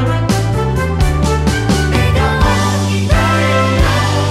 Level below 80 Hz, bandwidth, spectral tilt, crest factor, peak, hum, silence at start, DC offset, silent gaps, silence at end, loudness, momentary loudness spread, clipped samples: -20 dBFS; 15 kHz; -5.5 dB/octave; 12 dB; 0 dBFS; none; 0 s; under 0.1%; none; 0 s; -13 LUFS; 3 LU; under 0.1%